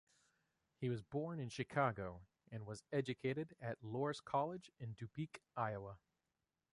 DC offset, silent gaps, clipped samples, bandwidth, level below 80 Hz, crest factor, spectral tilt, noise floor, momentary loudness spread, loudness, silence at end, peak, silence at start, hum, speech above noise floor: under 0.1%; none; under 0.1%; 11.5 kHz; -72 dBFS; 22 dB; -6.5 dB/octave; under -90 dBFS; 12 LU; -44 LUFS; 0.75 s; -24 dBFS; 0.8 s; none; over 46 dB